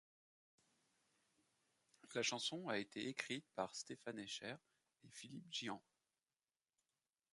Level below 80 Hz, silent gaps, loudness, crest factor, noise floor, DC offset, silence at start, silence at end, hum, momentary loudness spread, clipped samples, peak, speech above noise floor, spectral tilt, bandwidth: -90 dBFS; none; -47 LUFS; 28 dB; under -90 dBFS; under 0.1%; 2.05 s; 1.55 s; none; 13 LU; under 0.1%; -22 dBFS; over 42 dB; -2.5 dB/octave; 11.5 kHz